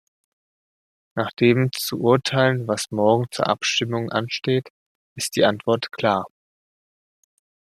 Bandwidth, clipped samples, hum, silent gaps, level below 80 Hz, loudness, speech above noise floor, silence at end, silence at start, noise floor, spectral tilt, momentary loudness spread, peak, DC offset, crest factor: 14.5 kHz; under 0.1%; none; 4.70-5.16 s; -64 dBFS; -21 LUFS; over 69 dB; 1.35 s; 1.15 s; under -90 dBFS; -5 dB/octave; 7 LU; -2 dBFS; under 0.1%; 20 dB